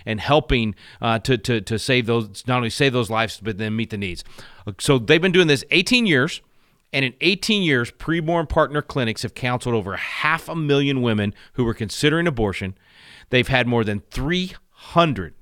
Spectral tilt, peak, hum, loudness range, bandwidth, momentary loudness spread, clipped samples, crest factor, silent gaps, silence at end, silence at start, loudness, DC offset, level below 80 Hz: -5 dB/octave; -2 dBFS; none; 4 LU; 16.5 kHz; 10 LU; under 0.1%; 18 dB; none; 0.1 s; 0.05 s; -20 LUFS; under 0.1%; -40 dBFS